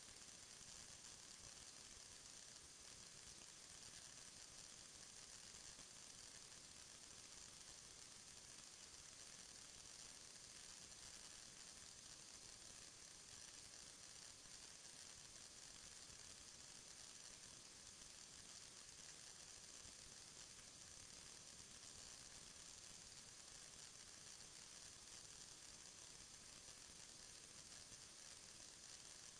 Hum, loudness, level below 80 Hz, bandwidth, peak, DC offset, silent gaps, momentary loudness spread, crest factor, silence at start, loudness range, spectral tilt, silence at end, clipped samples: none; -58 LUFS; -78 dBFS; 11 kHz; -46 dBFS; under 0.1%; none; 1 LU; 16 dB; 0 s; 1 LU; -0.5 dB/octave; 0 s; under 0.1%